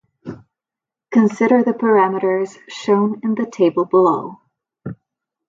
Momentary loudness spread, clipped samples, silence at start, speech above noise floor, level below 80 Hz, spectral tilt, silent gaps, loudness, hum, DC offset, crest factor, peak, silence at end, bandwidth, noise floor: 19 LU; under 0.1%; 0.25 s; 72 dB; -64 dBFS; -7 dB/octave; none; -17 LUFS; none; under 0.1%; 16 dB; -2 dBFS; 0.55 s; 7.6 kHz; -88 dBFS